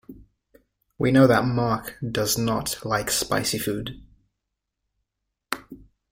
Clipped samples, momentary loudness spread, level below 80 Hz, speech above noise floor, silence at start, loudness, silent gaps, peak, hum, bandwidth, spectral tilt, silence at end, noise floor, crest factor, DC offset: under 0.1%; 16 LU; -52 dBFS; 59 dB; 0.1 s; -23 LUFS; none; -4 dBFS; none; 16.5 kHz; -4.5 dB/octave; 0.35 s; -82 dBFS; 22 dB; under 0.1%